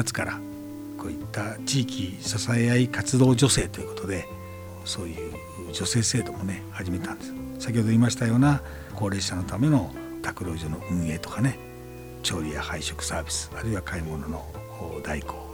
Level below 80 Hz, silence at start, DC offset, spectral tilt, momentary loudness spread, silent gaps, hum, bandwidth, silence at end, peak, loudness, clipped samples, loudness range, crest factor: -46 dBFS; 0 s; under 0.1%; -5 dB/octave; 15 LU; none; none; over 20 kHz; 0 s; -8 dBFS; -27 LUFS; under 0.1%; 6 LU; 20 dB